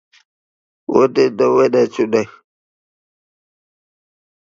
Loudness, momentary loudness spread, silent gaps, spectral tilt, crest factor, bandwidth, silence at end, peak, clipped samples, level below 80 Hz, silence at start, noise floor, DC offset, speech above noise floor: -15 LUFS; 10 LU; none; -6 dB/octave; 18 dB; 7.4 kHz; 2.25 s; 0 dBFS; under 0.1%; -62 dBFS; 0.9 s; under -90 dBFS; under 0.1%; over 76 dB